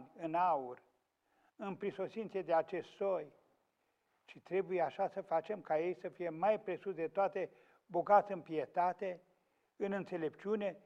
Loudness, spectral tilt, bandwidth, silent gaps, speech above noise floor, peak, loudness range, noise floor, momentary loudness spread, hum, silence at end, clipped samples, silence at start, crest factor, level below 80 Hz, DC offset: -38 LUFS; -7.5 dB/octave; 7.6 kHz; none; 44 dB; -18 dBFS; 5 LU; -81 dBFS; 10 LU; none; 0.05 s; under 0.1%; 0 s; 20 dB; -84 dBFS; under 0.1%